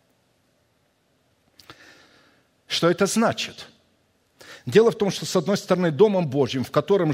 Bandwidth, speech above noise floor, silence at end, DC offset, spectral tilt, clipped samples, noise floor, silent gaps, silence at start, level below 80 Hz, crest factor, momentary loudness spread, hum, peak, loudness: 16 kHz; 46 dB; 0 s; under 0.1%; -5 dB/octave; under 0.1%; -66 dBFS; none; 1.7 s; -64 dBFS; 20 dB; 10 LU; none; -4 dBFS; -21 LUFS